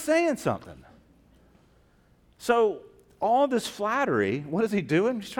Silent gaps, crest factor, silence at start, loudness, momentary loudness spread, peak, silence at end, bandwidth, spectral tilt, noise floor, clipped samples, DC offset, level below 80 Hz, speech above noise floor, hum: none; 18 dB; 0 s; -26 LUFS; 7 LU; -8 dBFS; 0 s; 18.5 kHz; -5.5 dB/octave; -61 dBFS; under 0.1%; under 0.1%; -62 dBFS; 36 dB; none